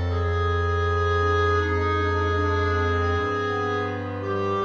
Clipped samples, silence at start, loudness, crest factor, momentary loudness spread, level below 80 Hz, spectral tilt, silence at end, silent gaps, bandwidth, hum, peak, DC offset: under 0.1%; 0 s; -24 LUFS; 12 dB; 5 LU; -36 dBFS; -7 dB/octave; 0 s; none; 6.6 kHz; none; -12 dBFS; under 0.1%